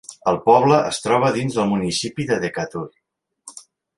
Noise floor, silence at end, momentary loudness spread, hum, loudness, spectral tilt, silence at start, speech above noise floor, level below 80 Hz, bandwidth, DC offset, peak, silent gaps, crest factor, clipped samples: -50 dBFS; 0.4 s; 21 LU; none; -19 LUFS; -5 dB/octave; 0.1 s; 31 dB; -56 dBFS; 11.5 kHz; under 0.1%; -2 dBFS; none; 18 dB; under 0.1%